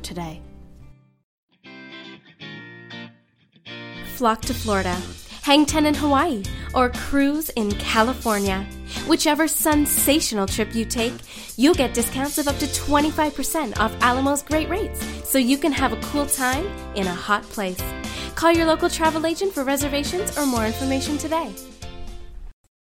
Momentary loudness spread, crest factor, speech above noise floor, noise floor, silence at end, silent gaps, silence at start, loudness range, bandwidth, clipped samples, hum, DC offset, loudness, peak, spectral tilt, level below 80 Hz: 19 LU; 20 dB; 37 dB; -58 dBFS; 0.35 s; 1.24-1.48 s; 0 s; 7 LU; 16.5 kHz; under 0.1%; none; under 0.1%; -21 LUFS; -4 dBFS; -3.5 dB/octave; -38 dBFS